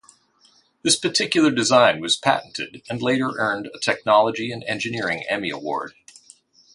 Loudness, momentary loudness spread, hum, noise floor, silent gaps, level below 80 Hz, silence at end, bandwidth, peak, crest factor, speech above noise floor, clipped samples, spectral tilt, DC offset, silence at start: -21 LUFS; 12 LU; none; -59 dBFS; none; -64 dBFS; 0.85 s; 11.5 kHz; -2 dBFS; 22 dB; 37 dB; under 0.1%; -3 dB/octave; under 0.1%; 0.85 s